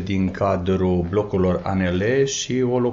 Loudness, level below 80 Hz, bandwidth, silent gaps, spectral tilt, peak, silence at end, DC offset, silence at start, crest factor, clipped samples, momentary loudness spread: -21 LUFS; -44 dBFS; 7.6 kHz; none; -6 dB/octave; -8 dBFS; 0 s; under 0.1%; 0 s; 12 dB; under 0.1%; 2 LU